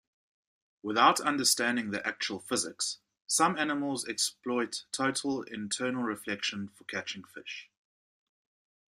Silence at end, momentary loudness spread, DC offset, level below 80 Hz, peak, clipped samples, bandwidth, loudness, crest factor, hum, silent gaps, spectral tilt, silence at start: 1.3 s; 15 LU; under 0.1%; -76 dBFS; -8 dBFS; under 0.1%; 15.5 kHz; -30 LUFS; 24 dB; none; none; -2 dB/octave; 0.85 s